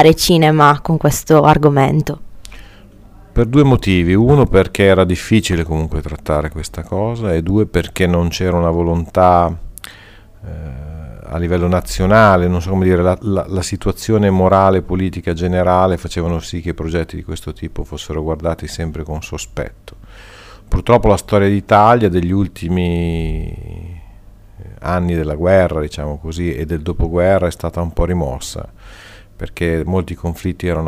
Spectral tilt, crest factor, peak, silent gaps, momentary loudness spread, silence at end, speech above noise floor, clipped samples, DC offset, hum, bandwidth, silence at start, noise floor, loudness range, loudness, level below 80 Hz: -6.5 dB/octave; 16 dB; 0 dBFS; none; 16 LU; 0 s; 26 dB; under 0.1%; under 0.1%; none; 16 kHz; 0 s; -40 dBFS; 7 LU; -15 LUFS; -28 dBFS